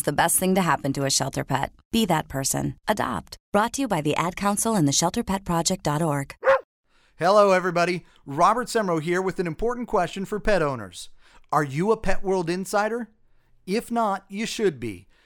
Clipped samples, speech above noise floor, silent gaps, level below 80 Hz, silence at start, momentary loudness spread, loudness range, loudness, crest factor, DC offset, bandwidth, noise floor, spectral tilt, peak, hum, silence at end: under 0.1%; 34 dB; 1.85-1.91 s, 3.40-3.52 s, 6.64-6.83 s; -42 dBFS; 0.05 s; 9 LU; 4 LU; -24 LUFS; 20 dB; under 0.1%; 18 kHz; -57 dBFS; -4 dB/octave; -4 dBFS; none; 0.25 s